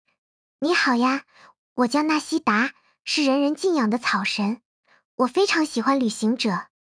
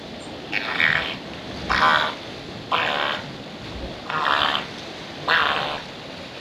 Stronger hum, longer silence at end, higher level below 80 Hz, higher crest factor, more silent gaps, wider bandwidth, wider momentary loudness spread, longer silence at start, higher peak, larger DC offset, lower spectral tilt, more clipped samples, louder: neither; first, 0.35 s vs 0 s; second, -74 dBFS vs -46 dBFS; second, 16 dB vs 22 dB; first, 1.58-1.76 s, 4.65-4.83 s, 5.05-5.18 s vs none; second, 10.5 kHz vs 16 kHz; second, 9 LU vs 16 LU; first, 0.6 s vs 0 s; second, -8 dBFS vs -4 dBFS; neither; about the same, -4 dB/octave vs -3.5 dB/octave; neither; about the same, -22 LUFS vs -22 LUFS